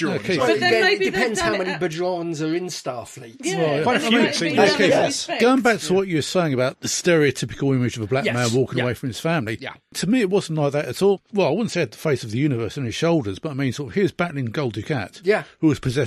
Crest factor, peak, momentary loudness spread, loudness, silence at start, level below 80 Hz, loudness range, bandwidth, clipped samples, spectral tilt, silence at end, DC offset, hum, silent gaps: 18 dB; -4 dBFS; 9 LU; -21 LUFS; 0 s; -52 dBFS; 4 LU; 14 kHz; under 0.1%; -5 dB/octave; 0 s; under 0.1%; none; none